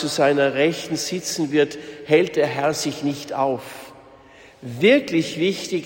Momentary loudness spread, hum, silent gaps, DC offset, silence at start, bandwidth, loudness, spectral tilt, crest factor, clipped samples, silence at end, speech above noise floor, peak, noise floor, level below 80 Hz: 13 LU; none; none; under 0.1%; 0 s; 16.5 kHz; -21 LUFS; -4.5 dB/octave; 18 dB; under 0.1%; 0 s; 27 dB; -4 dBFS; -47 dBFS; -62 dBFS